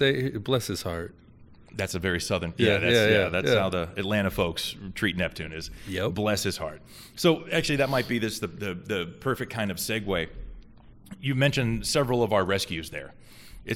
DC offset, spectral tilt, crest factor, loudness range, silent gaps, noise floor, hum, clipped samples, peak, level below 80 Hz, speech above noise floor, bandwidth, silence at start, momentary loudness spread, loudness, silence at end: under 0.1%; -4.5 dB/octave; 20 dB; 4 LU; none; -51 dBFS; none; under 0.1%; -8 dBFS; -48 dBFS; 25 dB; 17 kHz; 0 s; 13 LU; -27 LUFS; 0 s